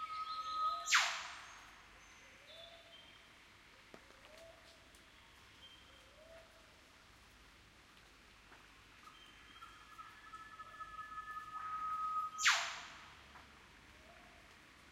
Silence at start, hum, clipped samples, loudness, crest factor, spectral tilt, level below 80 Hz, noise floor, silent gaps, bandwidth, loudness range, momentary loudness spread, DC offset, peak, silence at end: 0 s; none; under 0.1%; -38 LUFS; 28 dB; 1 dB/octave; -72 dBFS; -63 dBFS; none; 16 kHz; 21 LU; 27 LU; under 0.1%; -18 dBFS; 0 s